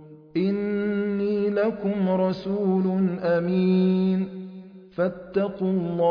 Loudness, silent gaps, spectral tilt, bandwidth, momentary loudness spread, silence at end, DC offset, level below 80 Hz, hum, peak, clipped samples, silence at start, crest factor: -24 LUFS; none; -10.5 dB/octave; 5.2 kHz; 7 LU; 0 s; under 0.1%; -60 dBFS; none; -12 dBFS; under 0.1%; 0 s; 12 dB